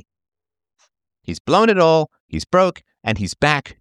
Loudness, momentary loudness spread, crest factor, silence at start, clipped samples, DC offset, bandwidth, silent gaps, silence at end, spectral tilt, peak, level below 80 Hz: -17 LUFS; 16 LU; 18 dB; 1.3 s; under 0.1%; under 0.1%; 11.5 kHz; 1.40-1.45 s, 2.20-2.29 s; 0.1 s; -5.5 dB/octave; -2 dBFS; -46 dBFS